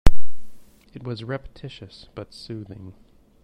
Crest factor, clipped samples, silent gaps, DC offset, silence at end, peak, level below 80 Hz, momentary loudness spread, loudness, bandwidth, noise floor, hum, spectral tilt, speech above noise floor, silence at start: 18 dB; 0.3%; none; under 0.1%; 0 s; 0 dBFS; -30 dBFS; 16 LU; -35 LUFS; 9.6 kHz; -37 dBFS; none; -6 dB/octave; 8 dB; 0.05 s